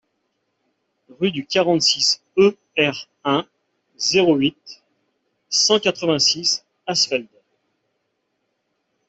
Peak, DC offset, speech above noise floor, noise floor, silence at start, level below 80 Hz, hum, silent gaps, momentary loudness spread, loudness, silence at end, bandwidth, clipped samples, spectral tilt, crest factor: -4 dBFS; under 0.1%; 54 dB; -73 dBFS; 1.2 s; -64 dBFS; none; none; 8 LU; -18 LUFS; 1.85 s; 8.4 kHz; under 0.1%; -3 dB/octave; 18 dB